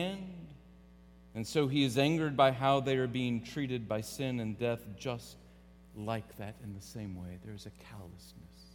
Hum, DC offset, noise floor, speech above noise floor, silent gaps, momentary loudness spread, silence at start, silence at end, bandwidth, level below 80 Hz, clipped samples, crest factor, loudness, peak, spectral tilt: none; under 0.1%; -57 dBFS; 23 dB; none; 22 LU; 0 s; 0.05 s; 19 kHz; -60 dBFS; under 0.1%; 24 dB; -33 LUFS; -12 dBFS; -6 dB/octave